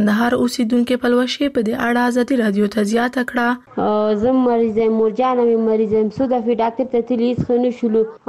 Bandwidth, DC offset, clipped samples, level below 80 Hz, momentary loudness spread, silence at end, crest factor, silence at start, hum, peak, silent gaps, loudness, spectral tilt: 15 kHz; 0.1%; under 0.1%; -52 dBFS; 3 LU; 0.1 s; 10 dB; 0 s; none; -6 dBFS; none; -17 LUFS; -6 dB/octave